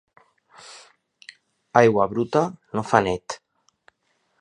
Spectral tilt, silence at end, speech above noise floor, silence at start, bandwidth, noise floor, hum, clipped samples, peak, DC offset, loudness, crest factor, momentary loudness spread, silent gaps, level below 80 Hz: -6 dB/octave; 1.05 s; 50 dB; 0.7 s; 10.5 kHz; -70 dBFS; none; under 0.1%; 0 dBFS; under 0.1%; -21 LUFS; 24 dB; 24 LU; none; -58 dBFS